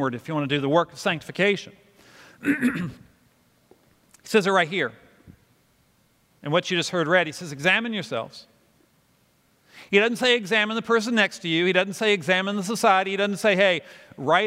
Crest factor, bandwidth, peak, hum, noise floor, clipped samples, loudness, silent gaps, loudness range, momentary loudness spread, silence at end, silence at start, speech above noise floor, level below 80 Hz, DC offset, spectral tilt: 22 dB; 16 kHz; -4 dBFS; none; -63 dBFS; under 0.1%; -23 LUFS; none; 6 LU; 9 LU; 0 s; 0 s; 40 dB; -68 dBFS; under 0.1%; -4.5 dB/octave